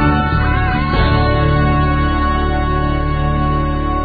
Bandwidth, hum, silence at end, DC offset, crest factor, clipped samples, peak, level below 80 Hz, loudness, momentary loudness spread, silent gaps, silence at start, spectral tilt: 4.8 kHz; none; 0 s; under 0.1%; 14 dB; under 0.1%; 0 dBFS; -18 dBFS; -15 LUFS; 4 LU; none; 0 s; -10 dB/octave